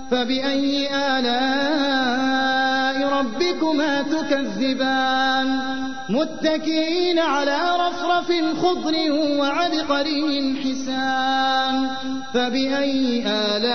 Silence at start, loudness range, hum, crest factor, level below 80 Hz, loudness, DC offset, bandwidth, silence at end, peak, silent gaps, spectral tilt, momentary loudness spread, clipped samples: 0 s; 1 LU; none; 14 dB; -56 dBFS; -21 LUFS; 2%; 6.6 kHz; 0 s; -8 dBFS; none; -3.5 dB/octave; 4 LU; under 0.1%